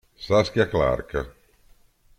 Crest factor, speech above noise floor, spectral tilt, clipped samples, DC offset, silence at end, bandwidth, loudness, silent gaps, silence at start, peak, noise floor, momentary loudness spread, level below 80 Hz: 18 dB; 34 dB; -6 dB/octave; under 0.1%; under 0.1%; 0.9 s; 14 kHz; -23 LUFS; none; 0.2 s; -6 dBFS; -56 dBFS; 11 LU; -42 dBFS